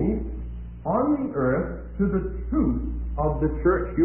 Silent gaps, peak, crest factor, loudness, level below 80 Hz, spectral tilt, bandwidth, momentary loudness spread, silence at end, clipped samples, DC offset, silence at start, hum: none; -8 dBFS; 16 dB; -26 LUFS; -32 dBFS; -14 dB/octave; 3 kHz; 10 LU; 0 s; under 0.1%; 0.1%; 0 s; none